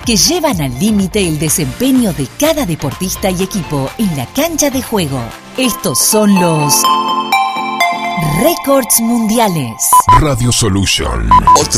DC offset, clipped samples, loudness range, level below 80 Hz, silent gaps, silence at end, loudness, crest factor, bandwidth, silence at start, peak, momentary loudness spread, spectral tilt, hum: under 0.1%; 0.2%; 4 LU; -28 dBFS; none; 0 s; -12 LUFS; 12 dB; over 20 kHz; 0 s; 0 dBFS; 8 LU; -4 dB/octave; none